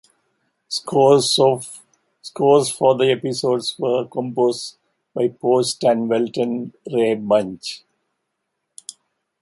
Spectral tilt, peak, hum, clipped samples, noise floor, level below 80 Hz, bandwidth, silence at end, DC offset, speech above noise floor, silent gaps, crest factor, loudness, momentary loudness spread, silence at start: -4.5 dB/octave; -2 dBFS; none; under 0.1%; -76 dBFS; -66 dBFS; 11.5 kHz; 1.65 s; under 0.1%; 58 dB; none; 18 dB; -19 LUFS; 20 LU; 0.7 s